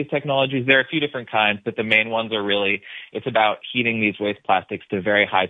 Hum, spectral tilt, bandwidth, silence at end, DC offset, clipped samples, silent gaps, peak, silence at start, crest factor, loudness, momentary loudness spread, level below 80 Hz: none; -7 dB/octave; 4.6 kHz; 0 s; under 0.1%; under 0.1%; none; 0 dBFS; 0 s; 20 dB; -20 LUFS; 8 LU; -66 dBFS